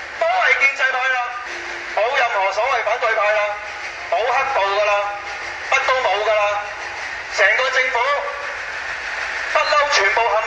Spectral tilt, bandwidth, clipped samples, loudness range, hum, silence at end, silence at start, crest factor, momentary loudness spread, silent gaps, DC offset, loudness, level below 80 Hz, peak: -0.5 dB/octave; 10 kHz; under 0.1%; 2 LU; none; 0 s; 0 s; 18 dB; 12 LU; none; under 0.1%; -18 LUFS; -54 dBFS; -2 dBFS